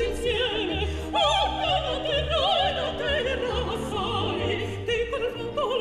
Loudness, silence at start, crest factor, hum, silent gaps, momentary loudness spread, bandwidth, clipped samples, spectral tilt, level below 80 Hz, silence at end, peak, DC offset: -26 LUFS; 0 s; 14 dB; none; none; 6 LU; 13.5 kHz; under 0.1%; -4.5 dB/octave; -38 dBFS; 0 s; -12 dBFS; under 0.1%